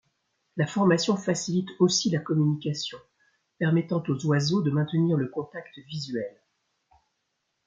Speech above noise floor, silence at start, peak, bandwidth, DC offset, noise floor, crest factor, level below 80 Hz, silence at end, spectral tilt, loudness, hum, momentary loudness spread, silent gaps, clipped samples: 53 dB; 0.55 s; -10 dBFS; 9.2 kHz; under 0.1%; -78 dBFS; 18 dB; -70 dBFS; 1.35 s; -5.5 dB/octave; -26 LUFS; none; 13 LU; none; under 0.1%